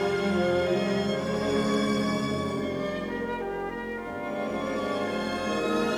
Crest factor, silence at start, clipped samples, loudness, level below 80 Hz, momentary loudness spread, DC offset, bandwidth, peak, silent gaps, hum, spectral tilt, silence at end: 14 dB; 0 s; under 0.1%; -28 LUFS; -54 dBFS; 7 LU; under 0.1%; 14.5 kHz; -14 dBFS; none; none; -5.5 dB/octave; 0 s